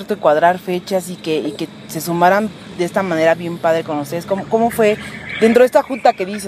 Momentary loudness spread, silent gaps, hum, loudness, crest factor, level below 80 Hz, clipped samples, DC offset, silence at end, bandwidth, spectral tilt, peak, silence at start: 10 LU; none; none; -16 LUFS; 16 dB; -54 dBFS; under 0.1%; under 0.1%; 0 s; 15.5 kHz; -5.5 dB/octave; 0 dBFS; 0 s